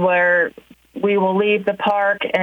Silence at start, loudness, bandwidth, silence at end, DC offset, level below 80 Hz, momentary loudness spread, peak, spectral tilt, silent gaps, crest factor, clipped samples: 0 s; -18 LUFS; 6.6 kHz; 0 s; under 0.1%; -62 dBFS; 9 LU; -4 dBFS; -7 dB/octave; none; 14 dB; under 0.1%